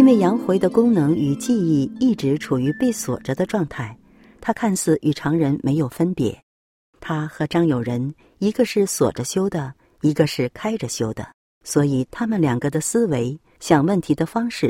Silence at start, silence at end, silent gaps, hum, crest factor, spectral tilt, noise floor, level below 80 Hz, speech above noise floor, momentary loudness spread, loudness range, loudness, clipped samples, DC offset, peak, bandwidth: 0 s; 0 s; 6.43-6.93 s, 11.34-11.61 s; none; 20 dB; -6 dB/octave; under -90 dBFS; -52 dBFS; over 70 dB; 10 LU; 3 LU; -21 LUFS; under 0.1%; under 0.1%; -2 dBFS; 16.5 kHz